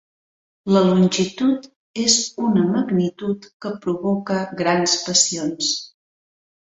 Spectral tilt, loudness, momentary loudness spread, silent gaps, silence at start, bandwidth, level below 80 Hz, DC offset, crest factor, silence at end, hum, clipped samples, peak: -4 dB/octave; -19 LUFS; 11 LU; 1.76-1.94 s, 3.54-3.60 s; 0.65 s; 8.4 kHz; -60 dBFS; under 0.1%; 18 dB; 0.8 s; none; under 0.1%; -2 dBFS